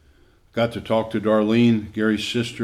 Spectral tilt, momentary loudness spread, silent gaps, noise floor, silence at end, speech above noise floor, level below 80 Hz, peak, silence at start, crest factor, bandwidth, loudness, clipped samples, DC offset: -6 dB/octave; 7 LU; none; -55 dBFS; 0 s; 34 dB; -54 dBFS; -6 dBFS; 0.55 s; 14 dB; 12.5 kHz; -21 LUFS; under 0.1%; under 0.1%